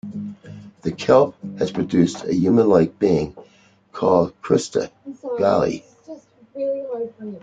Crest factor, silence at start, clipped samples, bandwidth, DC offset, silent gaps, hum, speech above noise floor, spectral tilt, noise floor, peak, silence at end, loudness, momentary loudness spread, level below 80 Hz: 18 dB; 0.05 s; under 0.1%; 9.2 kHz; under 0.1%; none; none; 36 dB; -7 dB/octave; -54 dBFS; -2 dBFS; 0.05 s; -20 LUFS; 20 LU; -54 dBFS